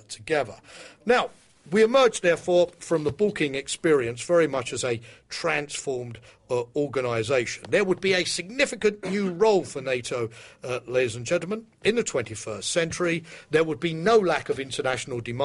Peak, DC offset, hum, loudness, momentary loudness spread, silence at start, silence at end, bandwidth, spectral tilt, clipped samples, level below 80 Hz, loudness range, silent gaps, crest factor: -8 dBFS; under 0.1%; none; -25 LUFS; 11 LU; 0.1 s; 0 s; 11.5 kHz; -4 dB/octave; under 0.1%; -60 dBFS; 4 LU; none; 16 dB